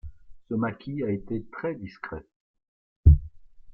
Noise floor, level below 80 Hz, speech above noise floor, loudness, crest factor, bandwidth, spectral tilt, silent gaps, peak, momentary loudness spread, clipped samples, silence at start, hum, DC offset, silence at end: -45 dBFS; -32 dBFS; 13 dB; -27 LUFS; 22 dB; 5.4 kHz; -11.5 dB/octave; 2.36-2.54 s, 2.68-3.04 s; -4 dBFS; 18 LU; under 0.1%; 0.05 s; none; under 0.1%; 0 s